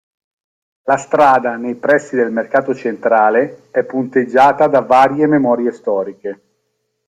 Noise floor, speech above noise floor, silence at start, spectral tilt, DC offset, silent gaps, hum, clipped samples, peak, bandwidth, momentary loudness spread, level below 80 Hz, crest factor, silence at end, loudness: -69 dBFS; 55 dB; 0.85 s; -6 dB/octave; under 0.1%; none; none; under 0.1%; 0 dBFS; 10.5 kHz; 10 LU; -58 dBFS; 14 dB; 0.75 s; -14 LUFS